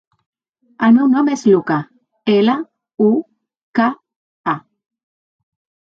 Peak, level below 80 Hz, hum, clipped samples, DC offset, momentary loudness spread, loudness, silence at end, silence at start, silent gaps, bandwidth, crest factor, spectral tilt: -2 dBFS; -68 dBFS; none; under 0.1%; under 0.1%; 13 LU; -16 LUFS; 1.3 s; 0.8 s; 2.94-2.98 s, 3.63-3.74 s, 4.16-4.44 s; 7.6 kHz; 16 dB; -6.5 dB/octave